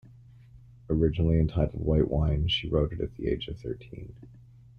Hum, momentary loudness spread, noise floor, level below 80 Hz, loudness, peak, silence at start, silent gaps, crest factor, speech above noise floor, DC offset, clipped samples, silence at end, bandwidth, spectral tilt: none; 14 LU; -52 dBFS; -38 dBFS; -28 LUFS; -10 dBFS; 0.55 s; none; 18 dB; 25 dB; under 0.1%; under 0.1%; 0.5 s; 6.4 kHz; -8.5 dB/octave